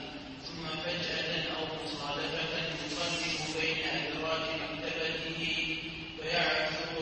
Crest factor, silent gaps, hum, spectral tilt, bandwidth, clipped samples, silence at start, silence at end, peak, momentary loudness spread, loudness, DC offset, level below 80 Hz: 18 dB; none; none; -3 dB/octave; 8.4 kHz; under 0.1%; 0 s; 0 s; -16 dBFS; 7 LU; -33 LUFS; under 0.1%; -58 dBFS